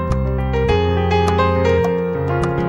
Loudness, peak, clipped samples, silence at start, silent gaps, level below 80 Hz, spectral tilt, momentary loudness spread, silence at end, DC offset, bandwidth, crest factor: -17 LUFS; -4 dBFS; under 0.1%; 0 s; none; -26 dBFS; -7.5 dB/octave; 4 LU; 0 s; under 0.1%; 10.5 kHz; 14 dB